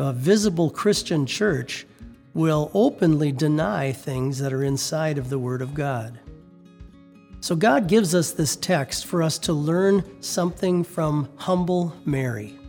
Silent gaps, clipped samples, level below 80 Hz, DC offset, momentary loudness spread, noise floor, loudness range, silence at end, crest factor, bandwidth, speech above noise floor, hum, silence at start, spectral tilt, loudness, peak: none; under 0.1%; -50 dBFS; under 0.1%; 8 LU; -47 dBFS; 5 LU; 0 s; 18 dB; 20 kHz; 25 dB; none; 0 s; -5.5 dB/octave; -23 LUFS; -6 dBFS